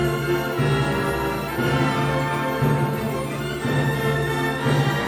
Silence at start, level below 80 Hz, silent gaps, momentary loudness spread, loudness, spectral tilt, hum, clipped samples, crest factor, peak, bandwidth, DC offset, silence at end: 0 s; -42 dBFS; none; 4 LU; -22 LUFS; -6 dB/octave; none; under 0.1%; 14 dB; -8 dBFS; 19 kHz; under 0.1%; 0 s